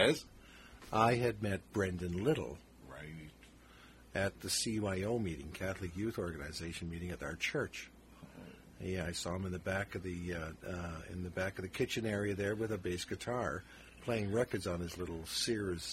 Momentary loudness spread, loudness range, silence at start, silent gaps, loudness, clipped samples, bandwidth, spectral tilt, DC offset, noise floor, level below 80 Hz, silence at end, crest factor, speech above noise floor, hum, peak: 19 LU; 5 LU; 0 s; none; -38 LUFS; under 0.1%; 16 kHz; -4.5 dB/octave; under 0.1%; -59 dBFS; -58 dBFS; 0 s; 26 dB; 22 dB; none; -12 dBFS